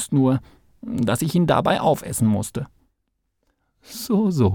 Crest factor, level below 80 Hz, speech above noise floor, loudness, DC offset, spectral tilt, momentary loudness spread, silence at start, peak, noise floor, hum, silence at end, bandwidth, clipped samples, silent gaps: 18 dB; -50 dBFS; 54 dB; -21 LUFS; under 0.1%; -6 dB/octave; 15 LU; 0 s; -4 dBFS; -74 dBFS; none; 0 s; 19 kHz; under 0.1%; none